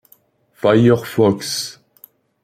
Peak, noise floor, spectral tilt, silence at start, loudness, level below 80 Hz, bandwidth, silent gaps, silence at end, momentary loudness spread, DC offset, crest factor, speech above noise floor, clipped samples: -2 dBFS; -55 dBFS; -5.5 dB/octave; 0.65 s; -16 LUFS; -56 dBFS; 16 kHz; none; 0.75 s; 11 LU; under 0.1%; 16 dB; 40 dB; under 0.1%